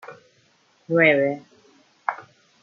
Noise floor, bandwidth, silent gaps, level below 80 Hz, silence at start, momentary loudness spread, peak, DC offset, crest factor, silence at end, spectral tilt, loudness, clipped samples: -61 dBFS; 7 kHz; none; -78 dBFS; 0.1 s; 18 LU; -4 dBFS; under 0.1%; 22 dB; 0.4 s; -7 dB/octave; -21 LUFS; under 0.1%